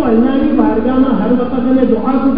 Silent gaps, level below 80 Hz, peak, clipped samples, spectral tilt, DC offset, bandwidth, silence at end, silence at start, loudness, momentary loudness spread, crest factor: none; -34 dBFS; 0 dBFS; under 0.1%; -11.5 dB/octave; 6%; 4.9 kHz; 0 s; 0 s; -12 LUFS; 2 LU; 12 dB